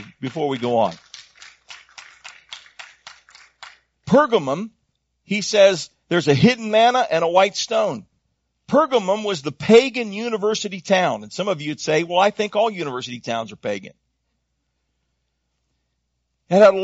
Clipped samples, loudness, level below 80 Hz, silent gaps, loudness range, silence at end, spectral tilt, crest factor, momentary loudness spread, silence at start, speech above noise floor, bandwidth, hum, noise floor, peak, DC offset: under 0.1%; -19 LUFS; -62 dBFS; none; 11 LU; 0 s; -3.5 dB/octave; 20 dB; 23 LU; 0 s; 55 dB; 8 kHz; none; -73 dBFS; -2 dBFS; under 0.1%